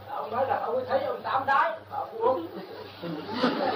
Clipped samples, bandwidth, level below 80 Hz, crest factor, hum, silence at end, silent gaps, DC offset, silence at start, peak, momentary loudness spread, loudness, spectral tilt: under 0.1%; 15.5 kHz; -72 dBFS; 18 dB; none; 0 s; none; under 0.1%; 0 s; -12 dBFS; 14 LU; -28 LUFS; -6.5 dB/octave